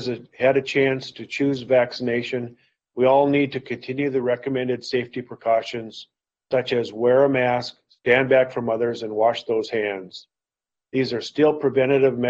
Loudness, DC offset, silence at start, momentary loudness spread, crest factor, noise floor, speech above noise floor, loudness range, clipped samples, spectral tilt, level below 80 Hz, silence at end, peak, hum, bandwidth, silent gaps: -22 LUFS; under 0.1%; 0 s; 13 LU; 18 dB; -89 dBFS; 68 dB; 4 LU; under 0.1%; -6.5 dB/octave; -64 dBFS; 0 s; -4 dBFS; none; 7.8 kHz; none